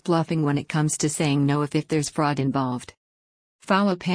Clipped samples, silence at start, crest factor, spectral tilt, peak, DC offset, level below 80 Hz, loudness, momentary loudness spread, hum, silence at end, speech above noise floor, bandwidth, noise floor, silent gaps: under 0.1%; 0.05 s; 16 dB; -5.5 dB/octave; -8 dBFS; under 0.1%; -60 dBFS; -23 LUFS; 4 LU; none; 0 s; over 67 dB; 10.5 kHz; under -90 dBFS; 2.97-3.59 s